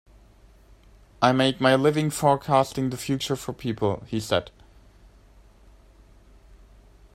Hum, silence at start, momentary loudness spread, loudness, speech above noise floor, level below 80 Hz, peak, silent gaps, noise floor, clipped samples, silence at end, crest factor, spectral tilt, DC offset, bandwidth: none; 1.2 s; 9 LU; -24 LUFS; 30 dB; -52 dBFS; -4 dBFS; none; -53 dBFS; under 0.1%; 2.65 s; 22 dB; -5.5 dB/octave; under 0.1%; 16 kHz